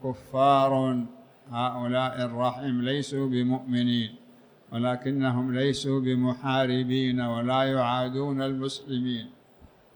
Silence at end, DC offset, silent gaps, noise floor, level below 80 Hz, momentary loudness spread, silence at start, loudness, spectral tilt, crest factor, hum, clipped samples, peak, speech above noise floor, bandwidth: 0.65 s; under 0.1%; none; -55 dBFS; -64 dBFS; 7 LU; 0 s; -27 LUFS; -6.5 dB/octave; 16 dB; none; under 0.1%; -10 dBFS; 29 dB; 19.5 kHz